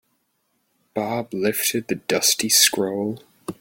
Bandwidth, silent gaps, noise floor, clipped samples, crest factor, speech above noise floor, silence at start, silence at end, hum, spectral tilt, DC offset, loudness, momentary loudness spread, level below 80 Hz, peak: 17 kHz; none; -70 dBFS; under 0.1%; 22 dB; 49 dB; 0.95 s; 0.05 s; none; -2 dB/octave; under 0.1%; -20 LUFS; 16 LU; -64 dBFS; -2 dBFS